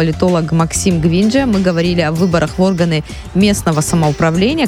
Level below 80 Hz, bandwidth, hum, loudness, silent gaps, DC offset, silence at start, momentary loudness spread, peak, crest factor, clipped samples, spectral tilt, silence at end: -32 dBFS; 15.5 kHz; none; -14 LUFS; none; under 0.1%; 0 s; 2 LU; 0 dBFS; 12 dB; under 0.1%; -5.5 dB/octave; 0 s